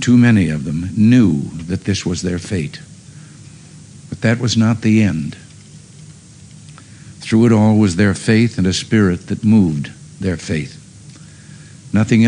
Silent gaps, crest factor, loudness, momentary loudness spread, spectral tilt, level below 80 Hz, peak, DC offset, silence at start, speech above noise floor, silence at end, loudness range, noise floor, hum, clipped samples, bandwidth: none; 14 dB; -15 LUFS; 13 LU; -6.5 dB/octave; -46 dBFS; -2 dBFS; under 0.1%; 0 s; 26 dB; 0 s; 5 LU; -40 dBFS; none; under 0.1%; 10.5 kHz